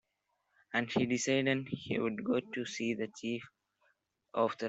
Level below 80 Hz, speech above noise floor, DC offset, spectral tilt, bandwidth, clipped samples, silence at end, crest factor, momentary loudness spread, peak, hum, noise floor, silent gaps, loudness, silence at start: -74 dBFS; 48 dB; under 0.1%; -4.5 dB/octave; 8.2 kHz; under 0.1%; 0 s; 18 dB; 9 LU; -18 dBFS; none; -82 dBFS; none; -35 LUFS; 0.75 s